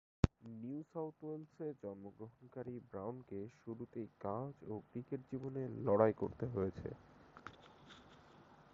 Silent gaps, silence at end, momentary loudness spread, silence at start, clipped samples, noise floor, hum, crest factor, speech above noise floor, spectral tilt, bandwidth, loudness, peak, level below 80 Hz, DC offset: none; 0.1 s; 23 LU; 0.25 s; under 0.1%; -63 dBFS; none; 30 dB; 21 dB; -8 dB/octave; 7.4 kHz; -43 LUFS; -14 dBFS; -58 dBFS; under 0.1%